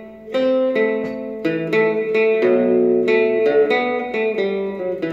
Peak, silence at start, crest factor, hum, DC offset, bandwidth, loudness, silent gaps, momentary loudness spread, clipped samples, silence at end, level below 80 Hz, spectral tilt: -6 dBFS; 0 s; 12 dB; none; under 0.1%; 7.2 kHz; -18 LUFS; none; 8 LU; under 0.1%; 0 s; -60 dBFS; -7 dB/octave